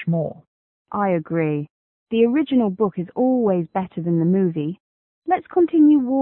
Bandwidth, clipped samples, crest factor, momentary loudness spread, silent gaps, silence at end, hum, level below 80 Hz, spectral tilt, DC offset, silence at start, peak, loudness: 3.9 kHz; under 0.1%; 14 dB; 14 LU; 0.47-0.85 s, 1.70-2.06 s, 4.80-5.22 s; 0 s; none; -62 dBFS; -13 dB/octave; under 0.1%; 0 s; -6 dBFS; -20 LUFS